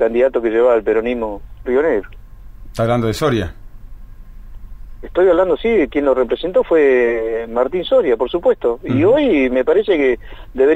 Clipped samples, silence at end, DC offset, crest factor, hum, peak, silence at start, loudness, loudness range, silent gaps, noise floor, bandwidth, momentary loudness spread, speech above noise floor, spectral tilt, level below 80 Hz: under 0.1%; 0 s; under 0.1%; 12 dB; none; -4 dBFS; 0 s; -16 LUFS; 6 LU; none; -34 dBFS; 15.5 kHz; 9 LU; 19 dB; -7 dB/octave; -36 dBFS